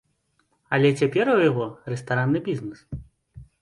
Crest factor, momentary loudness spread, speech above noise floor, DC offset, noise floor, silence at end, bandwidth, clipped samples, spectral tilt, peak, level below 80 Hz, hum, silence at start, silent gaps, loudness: 18 dB; 18 LU; 47 dB; under 0.1%; -69 dBFS; 0.2 s; 11.5 kHz; under 0.1%; -7 dB/octave; -6 dBFS; -54 dBFS; none; 0.7 s; none; -23 LUFS